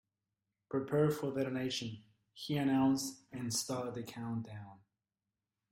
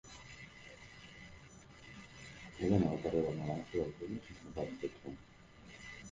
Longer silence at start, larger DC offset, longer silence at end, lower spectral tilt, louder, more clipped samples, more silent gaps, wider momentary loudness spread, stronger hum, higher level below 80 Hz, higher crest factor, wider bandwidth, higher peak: first, 0.7 s vs 0.05 s; neither; first, 0.95 s vs 0 s; second, -5 dB/octave vs -7 dB/octave; first, -36 LUFS vs -39 LUFS; neither; neither; second, 17 LU vs 21 LU; neither; second, -72 dBFS vs -60 dBFS; second, 18 dB vs 24 dB; first, 16 kHz vs 9.6 kHz; second, -20 dBFS vs -16 dBFS